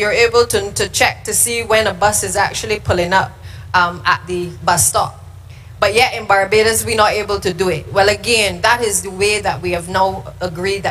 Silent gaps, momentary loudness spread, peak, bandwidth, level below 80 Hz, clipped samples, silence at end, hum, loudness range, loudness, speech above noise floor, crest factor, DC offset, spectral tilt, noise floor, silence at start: none; 7 LU; 0 dBFS; 15.5 kHz; -38 dBFS; under 0.1%; 0 s; none; 2 LU; -15 LUFS; 20 dB; 16 dB; under 0.1%; -2.5 dB/octave; -35 dBFS; 0 s